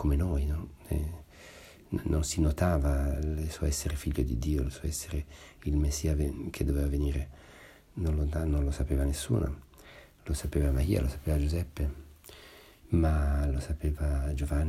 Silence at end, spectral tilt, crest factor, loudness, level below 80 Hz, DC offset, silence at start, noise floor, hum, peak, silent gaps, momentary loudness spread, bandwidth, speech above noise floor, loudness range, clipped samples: 0 s; -6.5 dB/octave; 16 dB; -31 LUFS; -32 dBFS; under 0.1%; 0 s; -53 dBFS; none; -14 dBFS; none; 18 LU; 14.5 kHz; 24 dB; 2 LU; under 0.1%